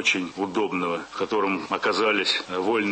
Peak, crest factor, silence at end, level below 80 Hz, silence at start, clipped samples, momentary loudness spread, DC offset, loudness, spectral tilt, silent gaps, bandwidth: -8 dBFS; 16 dB; 0 s; -66 dBFS; 0 s; under 0.1%; 6 LU; under 0.1%; -24 LUFS; -3.5 dB/octave; none; 8.8 kHz